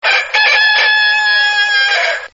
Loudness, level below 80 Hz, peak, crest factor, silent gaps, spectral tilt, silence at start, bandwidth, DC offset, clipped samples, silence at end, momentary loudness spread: -10 LUFS; -60 dBFS; 0 dBFS; 12 dB; none; 7.5 dB/octave; 0.05 s; 7.8 kHz; 0.1%; under 0.1%; 0.05 s; 3 LU